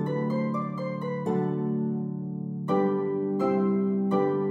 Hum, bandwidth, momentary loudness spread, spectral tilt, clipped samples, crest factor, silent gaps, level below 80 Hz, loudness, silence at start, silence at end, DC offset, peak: none; 6.4 kHz; 7 LU; -10 dB/octave; under 0.1%; 14 dB; none; -78 dBFS; -28 LUFS; 0 s; 0 s; under 0.1%; -14 dBFS